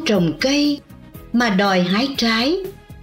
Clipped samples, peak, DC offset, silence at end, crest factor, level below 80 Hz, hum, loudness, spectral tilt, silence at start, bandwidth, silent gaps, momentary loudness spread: under 0.1%; -6 dBFS; under 0.1%; 0 s; 12 dB; -46 dBFS; none; -18 LUFS; -5 dB/octave; 0 s; 16 kHz; none; 8 LU